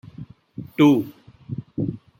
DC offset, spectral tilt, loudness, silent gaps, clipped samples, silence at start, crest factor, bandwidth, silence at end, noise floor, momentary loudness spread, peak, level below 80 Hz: under 0.1%; -7.5 dB/octave; -20 LUFS; none; under 0.1%; 0.2 s; 18 dB; 16 kHz; 0.25 s; -42 dBFS; 23 LU; -4 dBFS; -58 dBFS